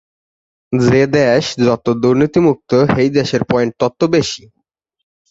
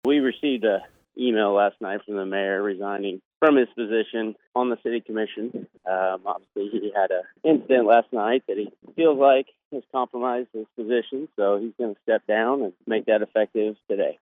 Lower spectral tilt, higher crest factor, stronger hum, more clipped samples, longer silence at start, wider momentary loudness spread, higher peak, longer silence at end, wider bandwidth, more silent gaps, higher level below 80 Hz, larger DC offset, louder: second, -6 dB/octave vs -7.5 dB/octave; about the same, 14 dB vs 18 dB; neither; neither; first, 0.7 s vs 0.05 s; second, 5 LU vs 12 LU; about the same, -2 dBFS vs -4 dBFS; first, 0.95 s vs 0.1 s; first, 8 kHz vs 3.9 kHz; second, none vs 3.25-3.31 s, 3.37-3.41 s, 4.47-4.52 s, 9.65-9.71 s; first, -46 dBFS vs -80 dBFS; neither; first, -14 LUFS vs -24 LUFS